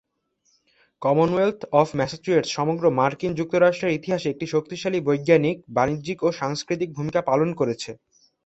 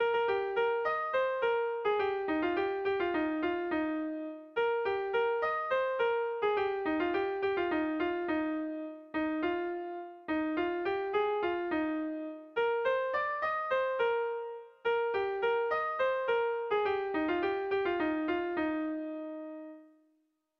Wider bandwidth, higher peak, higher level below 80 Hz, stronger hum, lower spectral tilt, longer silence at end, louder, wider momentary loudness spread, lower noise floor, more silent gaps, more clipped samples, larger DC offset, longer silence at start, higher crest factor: first, 8.2 kHz vs 6 kHz; first, -4 dBFS vs -18 dBFS; first, -58 dBFS vs -66 dBFS; neither; about the same, -6 dB/octave vs -6.5 dB/octave; second, 0.5 s vs 0.75 s; first, -23 LUFS vs -32 LUFS; about the same, 7 LU vs 8 LU; second, -69 dBFS vs -76 dBFS; neither; neither; neither; first, 1 s vs 0 s; first, 20 dB vs 14 dB